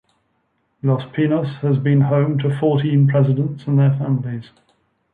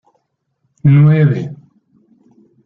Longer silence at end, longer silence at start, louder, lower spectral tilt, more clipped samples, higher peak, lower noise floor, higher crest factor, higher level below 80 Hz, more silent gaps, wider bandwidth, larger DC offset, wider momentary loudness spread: second, 0.7 s vs 1.1 s; about the same, 0.85 s vs 0.85 s; second, -18 LUFS vs -12 LUFS; about the same, -10.5 dB/octave vs -11 dB/octave; neither; about the same, -4 dBFS vs -2 dBFS; about the same, -67 dBFS vs -67 dBFS; about the same, 14 dB vs 14 dB; second, -60 dBFS vs -52 dBFS; neither; about the same, 4.4 kHz vs 4 kHz; neither; second, 6 LU vs 13 LU